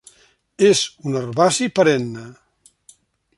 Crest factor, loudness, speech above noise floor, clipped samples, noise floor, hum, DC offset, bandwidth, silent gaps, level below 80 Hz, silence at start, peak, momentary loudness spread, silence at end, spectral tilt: 18 dB; -18 LUFS; 38 dB; under 0.1%; -56 dBFS; none; under 0.1%; 11.5 kHz; none; -62 dBFS; 0.6 s; -2 dBFS; 11 LU; 1.05 s; -4 dB/octave